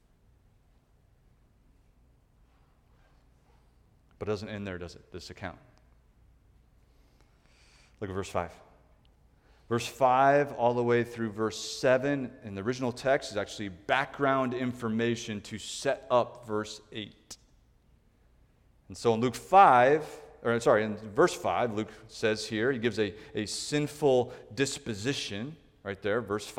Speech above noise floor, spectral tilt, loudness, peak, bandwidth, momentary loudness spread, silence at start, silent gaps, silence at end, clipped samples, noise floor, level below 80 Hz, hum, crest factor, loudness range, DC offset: 35 dB; -5 dB/octave; -29 LUFS; -8 dBFS; 16.5 kHz; 17 LU; 4.2 s; none; 0 s; under 0.1%; -64 dBFS; -62 dBFS; none; 24 dB; 17 LU; under 0.1%